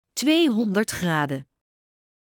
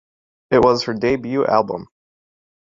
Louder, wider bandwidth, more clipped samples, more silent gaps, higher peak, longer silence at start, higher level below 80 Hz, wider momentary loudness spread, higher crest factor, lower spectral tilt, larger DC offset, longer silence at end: second, -22 LUFS vs -18 LUFS; first, 19.5 kHz vs 7.6 kHz; neither; neither; second, -8 dBFS vs 0 dBFS; second, 0.15 s vs 0.5 s; second, -60 dBFS vs -50 dBFS; about the same, 8 LU vs 8 LU; about the same, 16 dB vs 20 dB; second, -4.5 dB/octave vs -6 dB/octave; neither; about the same, 0.85 s vs 0.8 s